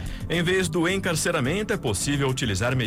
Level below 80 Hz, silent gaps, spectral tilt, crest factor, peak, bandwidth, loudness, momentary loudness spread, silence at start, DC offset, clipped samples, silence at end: -40 dBFS; none; -4.5 dB/octave; 12 dB; -12 dBFS; 16.5 kHz; -24 LUFS; 3 LU; 0 s; under 0.1%; under 0.1%; 0 s